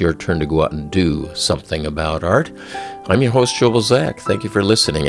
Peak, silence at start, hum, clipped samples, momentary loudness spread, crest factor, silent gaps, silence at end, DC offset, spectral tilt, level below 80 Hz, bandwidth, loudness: 0 dBFS; 0 s; none; under 0.1%; 8 LU; 18 dB; none; 0 s; under 0.1%; -5 dB/octave; -38 dBFS; 12 kHz; -17 LUFS